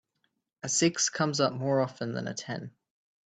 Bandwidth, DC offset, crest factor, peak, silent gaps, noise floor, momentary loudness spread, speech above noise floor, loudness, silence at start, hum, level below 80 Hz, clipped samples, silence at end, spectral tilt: 9.4 kHz; under 0.1%; 20 dB; -12 dBFS; none; -78 dBFS; 13 LU; 49 dB; -29 LUFS; 0.65 s; none; -74 dBFS; under 0.1%; 0.55 s; -3.5 dB/octave